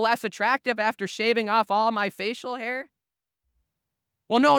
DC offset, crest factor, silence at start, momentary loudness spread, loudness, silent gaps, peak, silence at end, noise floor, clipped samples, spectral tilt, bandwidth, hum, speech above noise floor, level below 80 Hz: under 0.1%; 18 dB; 0 s; 9 LU; -25 LUFS; none; -8 dBFS; 0 s; -87 dBFS; under 0.1%; -4 dB/octave; 19.5 kHz; none; 64 dB; -78 dBFS